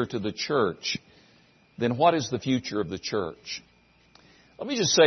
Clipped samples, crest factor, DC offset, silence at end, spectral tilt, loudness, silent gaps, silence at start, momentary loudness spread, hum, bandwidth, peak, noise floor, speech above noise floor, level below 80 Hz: under 0.1%; 20 dB; under 0.1%; 0 s; -4 dB/octave; -27 LUFS; none; 0 s; 13 LU; none; 6.4 kHz; -6 dBFS; -60 dBFS; 34 dB; -64 dBFS